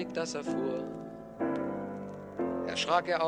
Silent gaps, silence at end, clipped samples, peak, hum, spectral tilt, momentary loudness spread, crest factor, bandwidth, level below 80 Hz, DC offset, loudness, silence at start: none; 0 s; under 0.1%; -14 dBFS; none; -4.5 dB/octave; 13 LU; 20 dB; 11 kHz; -68 dBFS; under 0.1%; -34 LUFS; 0 s